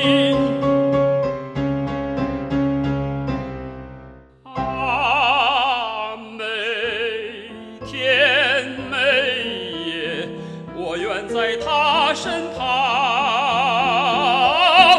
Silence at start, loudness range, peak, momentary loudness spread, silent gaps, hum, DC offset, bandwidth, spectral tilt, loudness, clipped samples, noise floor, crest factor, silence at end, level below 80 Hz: 0 s; 5 LU; 0 dBFS; 14 LU; none; none; under 0.1%; 11.5 kHz; -4.5 dB/octave; -19 LUFS; under 0.1%; -42 dBFS; 18 dB; 0 s; -44 dBFS